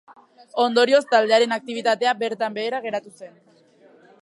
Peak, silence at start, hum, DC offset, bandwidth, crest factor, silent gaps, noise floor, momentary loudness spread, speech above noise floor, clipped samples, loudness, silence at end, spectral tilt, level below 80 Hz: -4 dBFS; 0.55 s; none; under 0.1%; 11.5 kHz; 18 dB; none; -53 dBFS; 12 LU; 32 dB; under 0.1%; -21 LUFS; 0.95 s; -3 dB/octave; -80 dBFS